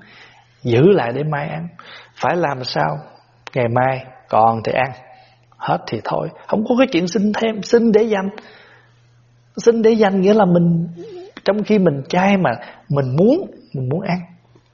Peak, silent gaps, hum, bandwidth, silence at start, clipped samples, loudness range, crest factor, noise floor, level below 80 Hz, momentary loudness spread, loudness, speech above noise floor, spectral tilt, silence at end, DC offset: 0 dBFS; none; none; 7.2 kHz; 0.65 s; under 0.1%; 4 LU; 16 dB; -52 dBFS; -56 dBFS; 14 LU; -17 LUFS; 36 dB; -6 dB/octave; 0.5 s; under 0.1%